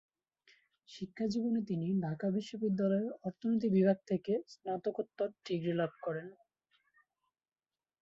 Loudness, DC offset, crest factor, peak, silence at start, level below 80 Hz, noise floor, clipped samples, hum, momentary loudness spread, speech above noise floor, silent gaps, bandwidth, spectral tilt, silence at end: -35 LUFS; under 0.1%; 18 dB; -18 dBFS; 0.9 s; -76 dBFS; -80 dBFS; under 0.1%; none; 10 LU; 45 dB; none; 7.6 kHz; -8 dB/octave; 1.7 s